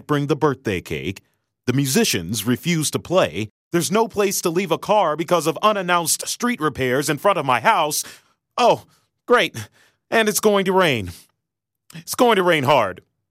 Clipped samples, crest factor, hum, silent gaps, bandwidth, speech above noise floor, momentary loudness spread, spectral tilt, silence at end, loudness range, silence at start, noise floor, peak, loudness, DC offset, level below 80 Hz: under 0.1%; 16 dB; none; 3.50-3.71 s; 16 kHz; 62 dB; 10 LU; -4 dB/octave; 0.35 s; 2 LU; 0.1 s; -82 dBFS; -4 dBFS; -19 LUFS; under 0.1%; -56 dBFS